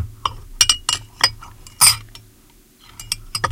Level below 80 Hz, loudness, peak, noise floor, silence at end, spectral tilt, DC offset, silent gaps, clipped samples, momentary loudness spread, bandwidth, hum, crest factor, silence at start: -40 dBFS; -17 LUFS; 0 dBFS; -50 dBFS; 0 s; 0.5 dB/octave; under 0.1%; none; under 0.1%; 15 LU; 17 kHz; none; 22 dB; 0 s